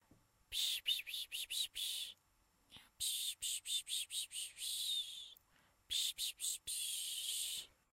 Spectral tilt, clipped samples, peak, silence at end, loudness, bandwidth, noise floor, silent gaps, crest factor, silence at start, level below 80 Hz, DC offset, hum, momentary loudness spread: 3.5 dB/octave; under 0.1%; -26 dBFS; 0.25 s; -40 LUFS; 16 kHz; -76 dBFS; none; 18 dB; 0.5 s; -76 dBFS; under 0.1%; none; 7 LU